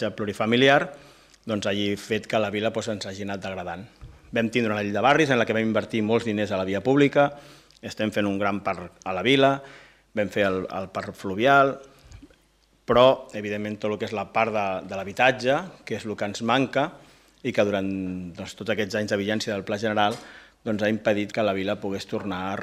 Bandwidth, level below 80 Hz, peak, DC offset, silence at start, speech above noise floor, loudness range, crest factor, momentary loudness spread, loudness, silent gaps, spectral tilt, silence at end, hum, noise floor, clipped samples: 15 kHz; -60 dBFS; -4 dBFS; under 0.1%; 0 s; 38 dB; 4 LU; 20 dB; 14 LU; -24 LUFS; none; -5.5 dB/octave; 0 s; none; -62 dBFS; under 0.1%